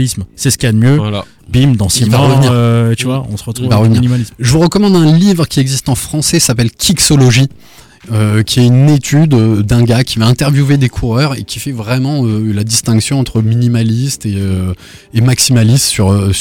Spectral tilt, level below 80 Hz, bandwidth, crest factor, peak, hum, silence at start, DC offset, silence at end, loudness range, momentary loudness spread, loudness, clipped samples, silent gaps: -5 dB/octave; -34 dBFS; 17.5 kHz; 10 dB; 0 dBFS; none; 0 s; under 0.1%; 0 s; 3 LU; 8 LU; -11 LUFS; under 0.1%; none